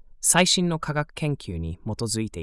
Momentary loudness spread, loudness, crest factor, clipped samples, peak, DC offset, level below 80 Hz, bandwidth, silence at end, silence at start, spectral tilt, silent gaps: 14 LU; -23 LUFS; 22 dB; under 0.1%; -4 dBFS; under 0.1%; -46 dBFS; 12 kHz; 0 s; 0.2 s; -3 dB/octave; none